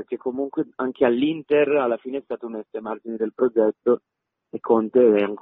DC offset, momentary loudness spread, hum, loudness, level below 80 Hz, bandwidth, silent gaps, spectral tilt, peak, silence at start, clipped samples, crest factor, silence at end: under 0.1%; 14 LU; none; -22 LUFS; -68 dBFS; 4 kHz; none; -10 dB/octave; -6 dBFS; 0 s; under 0.1%; 16 dB; 0.05 s